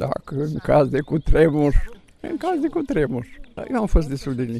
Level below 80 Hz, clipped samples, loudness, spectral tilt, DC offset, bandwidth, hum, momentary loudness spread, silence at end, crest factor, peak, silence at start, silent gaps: -26 dBFS; under 0.1%; -22 LUFS; -8 dB/octave; under 0.1%; 12 kHz; none; 14 LU; 0 s; 18 dB; -4 dBFS; 0 s; none